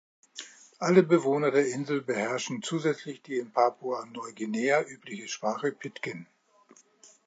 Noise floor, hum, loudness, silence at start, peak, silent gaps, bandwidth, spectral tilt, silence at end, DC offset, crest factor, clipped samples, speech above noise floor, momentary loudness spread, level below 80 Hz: -60 dBFS; none; -28 LUFS; 0.35 s; -6 dBFS; none; 9.2 kHz; -5 dB/octave; 1.05 s; under 0.1%; 24 dB; under 0.1%; 32 dB; 17 LU; -82 dBFS